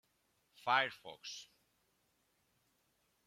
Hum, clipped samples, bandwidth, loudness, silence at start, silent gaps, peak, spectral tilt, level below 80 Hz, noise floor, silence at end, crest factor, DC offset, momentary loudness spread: none; under 0.1%; 16.5 kHz; -37 LUFS; 0.65 s; none; -16 dBFS; -2 dB/octave; -88 dBFS; -79 dBFS; 1.8 s; 28 dB; under 0.1%; 16 LU